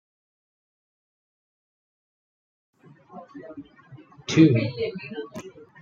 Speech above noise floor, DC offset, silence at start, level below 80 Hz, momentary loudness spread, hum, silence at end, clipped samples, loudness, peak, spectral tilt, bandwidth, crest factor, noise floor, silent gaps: 27 dB; under 0.1%; 3.15 s; -68 dBFS; 27 LU; none; 0.35 s; under 0.1%; -22 LUFS; -4 dBFS; -6.5 dB/octave; 7.4 kHz; 24 dB; -49 dBFS; none